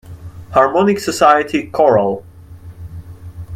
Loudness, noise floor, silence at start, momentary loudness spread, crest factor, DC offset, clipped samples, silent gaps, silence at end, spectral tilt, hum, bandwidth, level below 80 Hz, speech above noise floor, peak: -14 LUFS; -36 dBFS; 0.05 s; 23 LU; 16 dB; under 0.1%; under 0.1%; none; 0 s; -5.5 dB/octave; none; 16 kHz; -44 dBFS; 23 dB; 0 dBFS